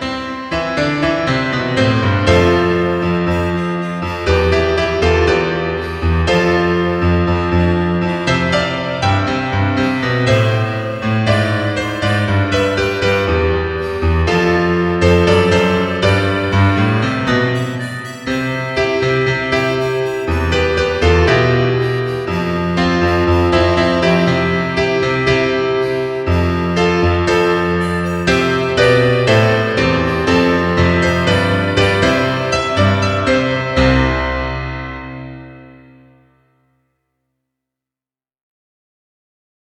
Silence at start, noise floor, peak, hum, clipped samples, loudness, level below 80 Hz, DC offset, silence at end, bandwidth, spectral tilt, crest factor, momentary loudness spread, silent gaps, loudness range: 0 s; under -90 dBFS; 0 dBFS; none; under 0.1%; -15 LUFS; -30 dBFS; under 0.1%; 3.95 s; 13 kHz; -6 dB/octave; 14 dB; 7 LU; none; 3 LU